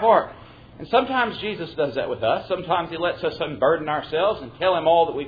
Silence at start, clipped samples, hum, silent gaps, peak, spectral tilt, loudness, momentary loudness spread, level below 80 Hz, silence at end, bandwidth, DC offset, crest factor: 0 s; under 0.1%; none; none; -4 dBFS; -7.5 dB/octave; -23 LUFS; 8 LU; -54 dBFS; 0 s; 5 kHz; under 0.1%; 18 dB